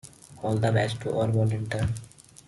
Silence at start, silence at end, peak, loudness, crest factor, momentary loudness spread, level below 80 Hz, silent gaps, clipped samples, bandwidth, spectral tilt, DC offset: 0.05 s; 0.4 s; -10 dBFS; -27 LUFS; 16 dB; 11 LU; -52 dBFS; none; under 0.1%; 12 kHz; -6.5 dB/octave; under 0.1%